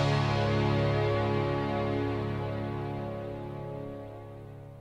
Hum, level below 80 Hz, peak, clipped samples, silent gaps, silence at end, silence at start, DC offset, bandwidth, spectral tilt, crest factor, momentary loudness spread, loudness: none; -48 dBFS; -16 dBFS; under 0.1%; none; 0 s; 0 s; under 0.1%; 8.6 kHz; -7.5 dB/octave; 14 dB; 16 LU; -31 LUFS